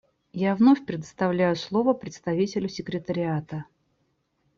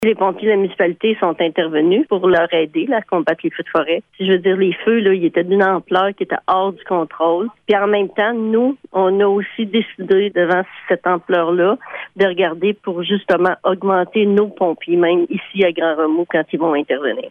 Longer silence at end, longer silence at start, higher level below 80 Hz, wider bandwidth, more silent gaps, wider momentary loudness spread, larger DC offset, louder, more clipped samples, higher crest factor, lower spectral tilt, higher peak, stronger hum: first, 0.95 s vs 0 s; first, 0.35 s vs 0 s; about the same, -64 dBFS vs -62 dBFS; first, 7.4 kHz vs 4.5 kHz; neither; first, 14 LU vs 5 LU; neither; second, -25 LUFS vs -17 LUFS; neither; about the same, 18 dB vs 14 dB; about the same, -7 dB/octave vs -8 dB/octave; second, -8 dBFS vs -2 dBFS; neither